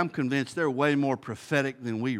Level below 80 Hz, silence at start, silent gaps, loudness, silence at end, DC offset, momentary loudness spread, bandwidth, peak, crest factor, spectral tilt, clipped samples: -74 dBFS; 0 s; none; -28 LUFS; 0 s; under 0.1%; 7 LU; 13 kHz; -10 dBFS; 18 dB; -6 dB/octave; under 0.1%